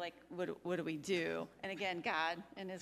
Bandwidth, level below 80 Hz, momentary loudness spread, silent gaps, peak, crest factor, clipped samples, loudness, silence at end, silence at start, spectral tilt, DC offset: 15 kHz; -78 dBFS; 9 LU; none; -22 dBFS; 18 dB; under 0.1%; -40 LUFS; 0 s; 0 s; -4.5 dB/octave; under 0.1%